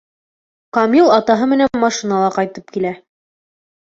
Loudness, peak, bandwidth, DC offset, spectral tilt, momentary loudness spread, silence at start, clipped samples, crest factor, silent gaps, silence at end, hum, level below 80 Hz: -15 LUFS; -2 dBFS; 7.8 kHz; under 0.1%; -5 dB/octave; 11 LU; 0.75 s; under 0.1%; 16 dB; none; 0.9 s; none; -58 dBFS